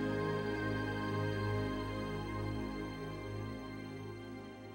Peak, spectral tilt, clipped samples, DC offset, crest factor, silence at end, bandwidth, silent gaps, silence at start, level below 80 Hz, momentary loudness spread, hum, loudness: -26 dBFS; -7 dB/octave; under 0.1%; under 0.1%; 14 dB; 0 s; 16.5 kHz; none; 0 s; -54 dBFS; 10 LU; none; -40 LUFS